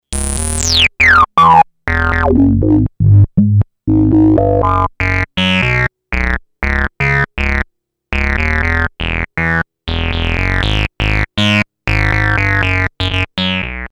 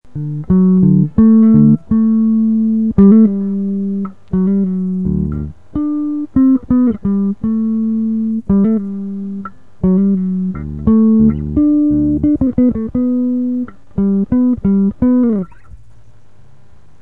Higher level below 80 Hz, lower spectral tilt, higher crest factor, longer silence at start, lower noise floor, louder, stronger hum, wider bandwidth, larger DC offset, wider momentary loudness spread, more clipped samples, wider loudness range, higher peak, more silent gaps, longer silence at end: first, -22 dBFS vs -34 dBFS; second, -5 dB/octave vs -13 dB/octave; about the same, 12 dB vs 14 dB; about the same, 0.1 s vs 0 s; about the same, -45 dBFS vs -47 dBFS; about the same, -13 LUFS vs -14 LUFS; neither; first, 13 kHz vs 2.2 kHz; second, under 0.1% vs 2%; second, 9 LU vs 12 LU; neither; about the same, 6 LU vs 6 LU; about the same, 0 dBFS vs 0 dBFS; neither; second, 0.05 s vs 1.25 s